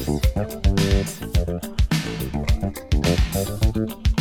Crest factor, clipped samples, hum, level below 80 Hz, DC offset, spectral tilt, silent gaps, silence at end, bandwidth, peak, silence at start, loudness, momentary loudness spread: 16 dB; under 0.1%; none; -24 dBFS; under 0.1%; -5.5 dB/octave; none; 0 s; 17.5 kHz; -4 dBFS; 0 s; -23 LUFS; 5 LU